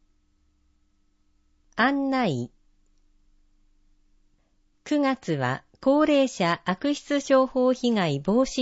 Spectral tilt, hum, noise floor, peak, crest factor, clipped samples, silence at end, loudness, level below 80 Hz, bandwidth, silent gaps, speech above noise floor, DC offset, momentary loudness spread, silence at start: -5.5 dB/octave; none; -66 dBFS; -8 dBFS; 18 dB; under 0.1%; 0 s; -24 LUFS; -58 dBFS; 8 kHz; none; 43 dB; under 0.1%; 7 LU; 1.8 s